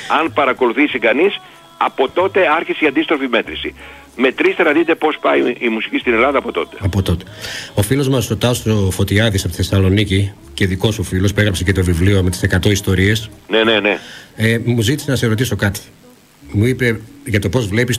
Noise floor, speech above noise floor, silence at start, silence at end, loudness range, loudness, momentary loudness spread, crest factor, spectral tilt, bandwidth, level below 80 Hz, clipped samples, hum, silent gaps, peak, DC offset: -42 dBFS; 27 dB; 0 s; 0 s; 2 LU; -16 LUFS; 7 LU; 16 dB; -5.5 dB/octave; 16 kHz; -38 dBFS; under 0.1%; none; none; 0 dBFS; under 0.1%